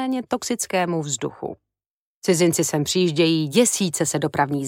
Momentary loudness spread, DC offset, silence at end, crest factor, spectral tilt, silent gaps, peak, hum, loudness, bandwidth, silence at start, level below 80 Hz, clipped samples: 9 LU; under 0.1%; 0 s; 18 dB; -4 dB/octave; 1.86-2.22 s; -4 dBFS; none; -21 LUFS; 16.5 kHz; 0 s; -62 dBFS; under 0.1%